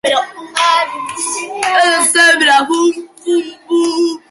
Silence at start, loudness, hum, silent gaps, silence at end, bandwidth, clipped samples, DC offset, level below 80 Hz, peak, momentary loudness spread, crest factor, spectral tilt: 0.05 s; -12 LUFS; none; none; 0.15 s; 12 kHz; under 0.1%; under 0.1%; -64 dBFS; 0 dBFS; 11 LU; 14 dB; 0 dB/octave